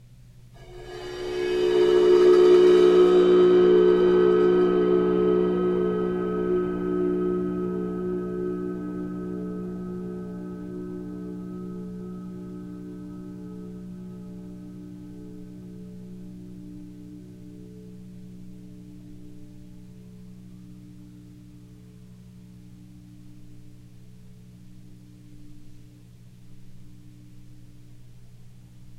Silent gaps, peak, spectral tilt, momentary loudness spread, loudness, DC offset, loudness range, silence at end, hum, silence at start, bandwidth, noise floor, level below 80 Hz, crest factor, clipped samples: none; -8 dBFS; -7.5 dB/octave; 27 LU; -22 LUFS; under 0.1%; 26 LU; 0.05 s; 60 Hz at -50 dBFS; 0.55 s; 8 kHz; -49 dBFS; -52 dBFS; 18 dB; under 0.1%